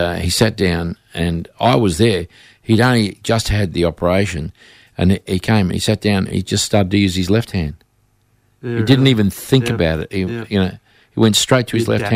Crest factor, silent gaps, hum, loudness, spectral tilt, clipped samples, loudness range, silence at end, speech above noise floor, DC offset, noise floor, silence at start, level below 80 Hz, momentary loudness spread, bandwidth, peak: 14 dB; none; none; -16 LUFS; -5.5 dB/octave; under 0.1%; 2 LU; 0 s; 43 dB; under 0.1%; -59 dBFS; 0 s; -36 dBFS; 9 LU; 16 kHz; -2 dBFS